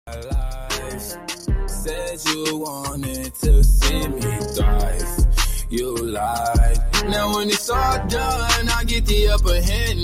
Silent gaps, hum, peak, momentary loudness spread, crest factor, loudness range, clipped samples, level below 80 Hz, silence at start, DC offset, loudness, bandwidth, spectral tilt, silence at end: none; none; -4 dBFS; 9 LU; 14 dB; 3 LU; under 0.1%; -20 dBFS; 0.05 s; under 0.1%; -21 LUFS; 16 kHz; -4 dB/octave; 0 s